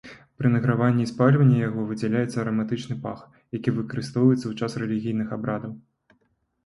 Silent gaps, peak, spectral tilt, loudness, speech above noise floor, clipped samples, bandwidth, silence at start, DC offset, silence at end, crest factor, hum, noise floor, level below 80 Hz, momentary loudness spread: none; -4 dBFS; -8 dB/octave; -24 LUFS; 46 dB; under 0.1%; 11.5 kHz; 0.05 s; under 0.1%; 0.85 s; 20 dB; none; -70 dBFS; -60 dBFS; 12 LU